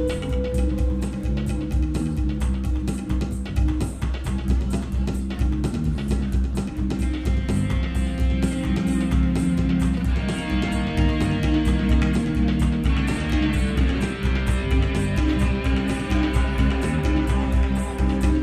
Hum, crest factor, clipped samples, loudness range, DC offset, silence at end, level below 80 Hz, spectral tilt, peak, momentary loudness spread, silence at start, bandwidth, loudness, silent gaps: none; 14 dB; under 0.1%; 3 LU; under 0.1%; 0 s; -24 dBFS; -7 dB/octave; -8 dBFS; 5 LU; 0 s; 11.5 kHz; -23 LUFS; none